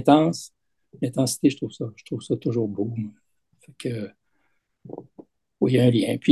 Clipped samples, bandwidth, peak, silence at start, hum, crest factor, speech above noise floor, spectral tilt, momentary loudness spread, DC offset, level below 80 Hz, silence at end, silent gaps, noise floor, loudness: under 0.1%; 12.5 kHz; -2 dBFS; 0 s; none; 22 dB; 49 dB; -6 dB/octave; 21 LU; under 0.1%; -64 dBFS; 0 s; none; -71 dBFS; -24 LUFS